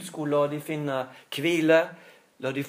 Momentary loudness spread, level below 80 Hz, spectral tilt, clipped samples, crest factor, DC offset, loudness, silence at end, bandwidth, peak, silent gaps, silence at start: 14 LU; -84 dBFS; -5.5 dB/octave; under 0.1%; 20 dB; under 0.1%; -26 LUFS; 0 s; 15.5 kHz; -8 dBFS; none; 0 s